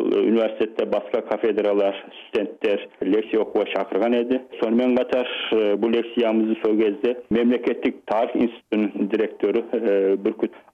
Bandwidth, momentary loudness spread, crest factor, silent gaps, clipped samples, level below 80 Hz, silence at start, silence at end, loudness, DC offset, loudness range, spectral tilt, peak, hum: 6.4 kHz; 5 LU; 12 dB; none; under 0.1%; -64 dBFS; 0 s; 0.15 s; -22 LUFS; under 0.1%; 2 LU; -7.5 dB/octave; -10 dBFS; none